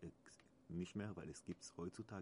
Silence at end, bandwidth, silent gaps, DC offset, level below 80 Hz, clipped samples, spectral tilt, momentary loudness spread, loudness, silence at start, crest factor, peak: 0 s; 10.5 kHz; none; under 0.1%; -74 dBFS; under 0.1%; -6 dB/octave; 18 LU; -51 LUFS; 0 s; 18 dB; -34 dBFS